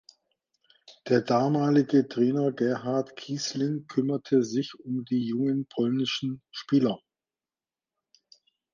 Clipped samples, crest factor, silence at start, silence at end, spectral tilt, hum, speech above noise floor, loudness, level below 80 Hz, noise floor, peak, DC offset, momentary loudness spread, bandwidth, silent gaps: under 0.1%; 18 dB; 0.9 s; 1.75 s; -6 dB/octave; none; over 64 dB; -27 LUFS; -74 dBFS; under -90 dBFS; -10 dBFS; under 0.1%; 9 LU; 7.4 kHz; none